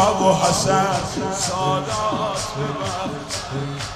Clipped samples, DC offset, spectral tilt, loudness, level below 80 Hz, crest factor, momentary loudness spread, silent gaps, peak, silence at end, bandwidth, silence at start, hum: under 0.1%; under 0.1%; -4 dB/octave; -21 LUFS; -44 dBFS; 18 dB; 10 LU; none; -4 dBFS; 0 s; 15.5 kHz; 0 s; none